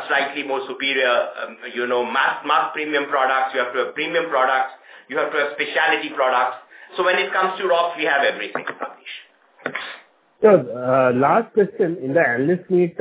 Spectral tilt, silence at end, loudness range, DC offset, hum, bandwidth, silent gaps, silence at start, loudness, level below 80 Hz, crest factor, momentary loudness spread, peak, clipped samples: -8.5 dB/octave; 0 s; 3 LU; under 0.1%; none; 4 kHz; none; 0 s; -20 LUFS; -72 dBFS; 20 dB; 12 LU; 0 dBFS; under 0.1%